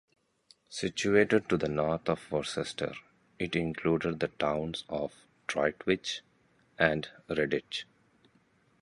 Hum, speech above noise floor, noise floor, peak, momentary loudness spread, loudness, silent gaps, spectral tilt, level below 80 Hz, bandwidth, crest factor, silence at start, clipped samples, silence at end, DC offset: none; 37 dB; -68 dBFS; -8 dBFS; 12 LU; -31 LUFS; none; -5 dB/octave; -58 dBFS; 11.5 kHz; 24 dB; 0.7 s; under 0.1%; 1 s; under 0.1%